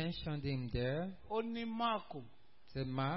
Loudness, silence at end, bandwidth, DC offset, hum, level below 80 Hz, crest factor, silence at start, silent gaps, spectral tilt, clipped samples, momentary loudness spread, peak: -40 LUFS; 0 s; 5.6 kHz; 0.2%; none; -56 dBFS; 14 dB; 0 s; none; -5 dB/octave; under 0.1%; 9 LU; -24 dBFS